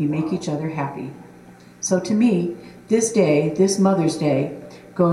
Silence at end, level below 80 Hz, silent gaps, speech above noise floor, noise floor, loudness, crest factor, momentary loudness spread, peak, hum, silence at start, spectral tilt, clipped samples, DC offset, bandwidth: 0 s; -60 dBFS; none; 25 dB; -45 dBFS; -20 LUFS; 16 dB; 15 LU; -6 dBFS; 60 Hz at -45 dBFS; 0 s; -6 dB/octave; under 0.1%; under 0.1%; 13.5 kHz